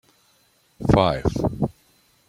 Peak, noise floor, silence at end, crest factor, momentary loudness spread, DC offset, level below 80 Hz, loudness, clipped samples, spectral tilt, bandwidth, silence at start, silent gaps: -2 dBFS; -62 dBFS; 0.55 s; 22 dB; 10 LU; under 0.1%; -38 dBFS; -22 LUFS; under 0.1%; -7.5 dB/octave; 15.5 kHz; 0.8 s; none